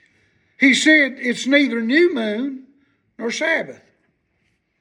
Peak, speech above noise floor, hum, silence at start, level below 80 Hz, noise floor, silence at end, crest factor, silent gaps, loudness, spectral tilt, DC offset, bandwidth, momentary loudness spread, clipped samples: -2 dBFS; 50 dB; none; 0.6 s; -74 dBFS; -67 dBFS; 1.05 s; 18 dB; none; -17 LUFS; -3 dB/octave; under 0.1%; 11 kHz; 16 LU; under 0.1%